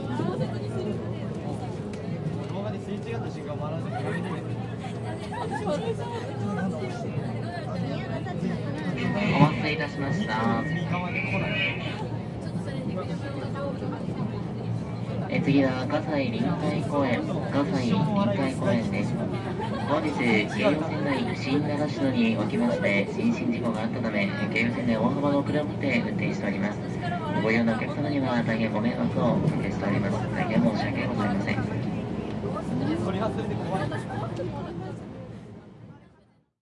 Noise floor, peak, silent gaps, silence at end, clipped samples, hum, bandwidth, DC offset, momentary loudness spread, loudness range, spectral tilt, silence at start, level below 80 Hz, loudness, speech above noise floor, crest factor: -61 dBFS; -4 dBFS; none; 0.65 s; under 0.1%; none; 11 kHz; under 0.1%; 9 LU; 6 LU; -7.5 dB/octave; 0 s; -52 dBFS; -27 LUFS; 35 dB; 22 dB